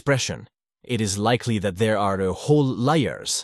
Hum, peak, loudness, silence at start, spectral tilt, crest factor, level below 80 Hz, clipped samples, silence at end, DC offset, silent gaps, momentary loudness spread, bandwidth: none; -6 dBFS; -22 LUFS; 0.05 s; -5 dB/octave; 16 dB; -54 dBFS; under 0.1%; 0 s; under 0.1%; none; 6 LU; 12.5 kHz